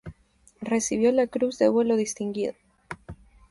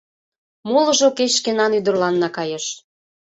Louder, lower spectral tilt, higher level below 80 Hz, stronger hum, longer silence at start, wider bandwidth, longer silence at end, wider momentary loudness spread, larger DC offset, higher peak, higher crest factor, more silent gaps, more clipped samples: second, -24 LUFS vs -18 LUFS; first, -4.5 dB/octave vs -3 dB/octave; first, -56 dBFS vs -66 dBFS; neither; second, 0.05 s vs 0.65 s; first, 11.5 kHz vs 8.4 kHz; about the same, 0.35 s vs 0.45 s; first, 19 LU vs 12 LU; neither; second, -8 dBFS vs -4 dBFS; about the same, 18 dB vs 16 dB; neither; neither